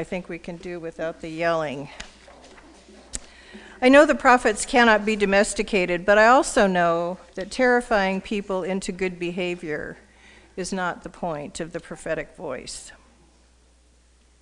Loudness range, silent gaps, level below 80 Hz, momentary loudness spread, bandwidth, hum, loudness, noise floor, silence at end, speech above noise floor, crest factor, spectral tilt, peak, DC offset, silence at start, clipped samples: 14 LU; none; -48 dBFS; 19 LU; 10.5 kHz; none; -21 LUFS; -57 dBFS; 1.5 s; 35 dB; 22 dB; -4 dB/octave; -2 dBFS; under 0.1%; 0 s; under 0.1%